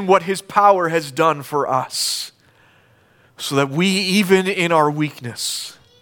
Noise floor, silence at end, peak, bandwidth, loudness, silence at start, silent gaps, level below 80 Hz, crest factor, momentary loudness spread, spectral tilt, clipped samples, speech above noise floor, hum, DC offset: -54 dBFS; 0.3 s; -2 dBFS; 19 kHz; -18 LUFS; 0 s; none; -66 dBFS; 18 dB; 10 LU; -4 dB/octave; under 0.1%; 36 dB; none; under 0.1%